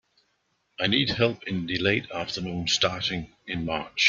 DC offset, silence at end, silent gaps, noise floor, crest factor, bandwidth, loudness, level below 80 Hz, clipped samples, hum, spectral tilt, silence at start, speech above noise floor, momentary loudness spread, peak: under 0.1%; 0 s; none; -72 dBFS; 22 dB; 7.6 kHz; -26 LUFS; -54 dBFS; under 0.1%; none; -4 dB/octave; 0.8 s; 46 dB; 9 LU; -6 dBFS